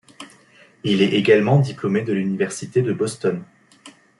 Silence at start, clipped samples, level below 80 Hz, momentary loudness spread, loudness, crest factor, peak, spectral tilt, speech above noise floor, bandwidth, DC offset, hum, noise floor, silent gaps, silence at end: 0.2 s; under 0.1%; -62 dBFS; 9 LU; -20 LUFS; 18 dB; -2 dBFS; -6 dB/octave; 33 dB; 11.5 kHz; under 0.1%; none; -52 dBFS; none; 0.3 s